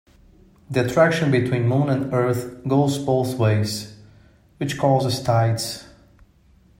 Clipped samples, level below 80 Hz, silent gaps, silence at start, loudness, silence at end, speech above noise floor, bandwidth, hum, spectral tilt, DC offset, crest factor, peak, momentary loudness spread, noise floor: under 0.1%; -54 dBFS; none; 0.7 s; -21 LUFS; 0.95 s; 35 dB; 16 kHz; none; -6 dB/octave; under 0.1%; 18 dB; -4 dBFS; 11 LU; -55 dBFS